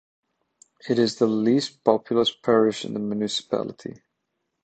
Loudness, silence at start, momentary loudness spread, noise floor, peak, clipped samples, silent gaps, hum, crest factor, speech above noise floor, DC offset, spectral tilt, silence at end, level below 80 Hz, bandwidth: -23 LUFS; 0.85 s; 12 LU; -78 dBFS; -2 dBFS; under 0.1%; none; none; 22 dB; 55 dB; under 0.1%; -5 dB/octave; 0.75 s; -68 dBFS; 9 kHz